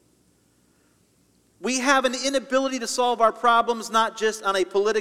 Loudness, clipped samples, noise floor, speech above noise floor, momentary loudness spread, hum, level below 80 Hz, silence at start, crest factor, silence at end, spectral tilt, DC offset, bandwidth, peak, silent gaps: -22 LUFS; under 0.1%; -63 dBFS; 40 dB; 5 LU; none; -64 dBFS; 1.6 s; 18 dB; 0 s; -1.5 dB/octave; under 0.1%; 16 kHz; -6 dBFS; none